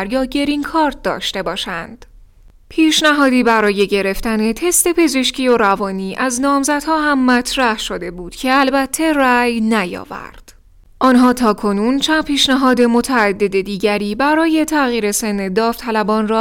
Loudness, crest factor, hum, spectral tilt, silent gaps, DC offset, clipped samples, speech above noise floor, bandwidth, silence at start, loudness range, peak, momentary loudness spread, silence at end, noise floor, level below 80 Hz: -15 LUFS; 14 dB; none; -3.5 dB/octave; none; under 0.1%; under 0.1%; 30 dB; 17 kHz; 0 s; 2 LU; -2 dBFS; 9 LU; 0 s; -45 dBFS; -40 dBFS